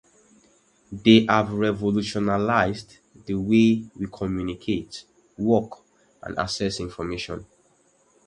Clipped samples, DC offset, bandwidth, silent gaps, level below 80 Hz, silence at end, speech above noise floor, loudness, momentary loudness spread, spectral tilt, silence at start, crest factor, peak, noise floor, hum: under 0.1%; under 0.1%; 10 kHz; none; -50 dBFS; 0.8 s; 39 dB; -23 LUFS; 20 LU; -6 dB/octave; 0.9 s; 24 dB; 0 dBFS; -62 dBFS; none